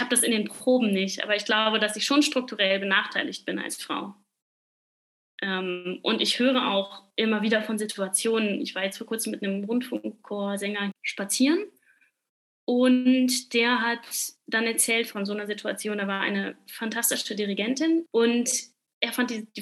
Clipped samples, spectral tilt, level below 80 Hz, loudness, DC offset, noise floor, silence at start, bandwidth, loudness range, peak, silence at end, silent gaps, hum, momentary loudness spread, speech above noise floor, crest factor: under 0.1%; -2.5 dB/octave; under -90 dBFS; -25 LUFS; under 0.1%; -65 dBFS; 0 s; 14 kHz; 5 LU; -6 dBFS; 0 s; 4.42-5.38 s, 12.29-12.67 s, 18.93-19.01 s; none; 10 LU; 39 dB; 20 dB